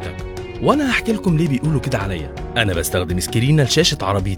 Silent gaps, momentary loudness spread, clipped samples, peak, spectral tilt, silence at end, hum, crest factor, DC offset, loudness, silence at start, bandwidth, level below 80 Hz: none; 10 LU; under 0.1%; 0 dBFS; -5 dB/octave; 0 s; none; 18 dB; under 0.1%; -18 LUFS; 0 s; 19.5 kHz; -34 dBFS